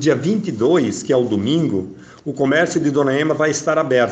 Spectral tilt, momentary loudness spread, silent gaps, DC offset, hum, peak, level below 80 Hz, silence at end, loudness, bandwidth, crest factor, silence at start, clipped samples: -5.5 dB/octave; 6 LU; none; under 0.1%; none; -4 dBFS; -58 dBFS; 0 s; -17 LUFS; 9 kHz; 14 dB; 0 s; under 0.1%